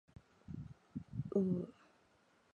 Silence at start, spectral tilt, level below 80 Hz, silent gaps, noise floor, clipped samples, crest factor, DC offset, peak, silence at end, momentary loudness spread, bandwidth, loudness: 0.5 s; -10.5 dB/octave; -66 dBFS; none; -72 dBFS; under 0.1%; 20 dB; under 0.1%; -22 dBFS; 0.8 s; 16 LU; 7 kHz; -42 LUFS